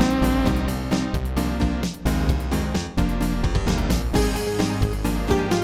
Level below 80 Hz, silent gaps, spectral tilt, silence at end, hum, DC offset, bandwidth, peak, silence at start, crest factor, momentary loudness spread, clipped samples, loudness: -26 dBFS; none; -6 dB/octave; 0 s; none; under 0.1%; 16 kHz; -6 dBFS; 0 s; 16 dB; 4 LU; under 0.1%; -23 LUFS